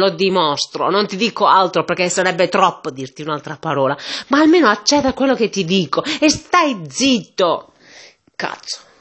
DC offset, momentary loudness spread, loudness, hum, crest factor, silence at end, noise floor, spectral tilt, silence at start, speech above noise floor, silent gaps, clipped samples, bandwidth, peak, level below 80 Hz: under 0.1%; 13 LU; -16 LUFS; none; 16 dB; 0.25 s; -44 dBFS; -3.5 dB/octave; 0 s; 28 dB; none; under 0.1%; 8.6 kHz; 0 dBFS; -52 dBFS